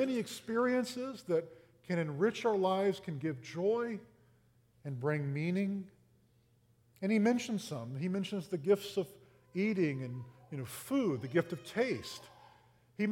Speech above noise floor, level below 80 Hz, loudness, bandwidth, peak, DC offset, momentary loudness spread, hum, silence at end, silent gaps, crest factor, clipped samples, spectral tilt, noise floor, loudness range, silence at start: 35 dB; -76 dBFS; -35 LUFS; 17 kHz; -18 dBFS; under 0.1%; 13 LU; none; 0 s; none; 18 dB; under 0.1%; -6.5 dB/octave; -69 dBFS; 3 LU; 0 s